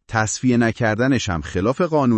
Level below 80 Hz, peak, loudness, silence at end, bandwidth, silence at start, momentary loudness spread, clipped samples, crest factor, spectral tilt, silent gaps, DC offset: -46 dBFS; -4 dBFS; -19 LUFS; 0 s; 8.8 kHz; 0.1 s; 4 LU; under 0.1%; 14 dB; -5.5 dB/octave; none; under 0.1%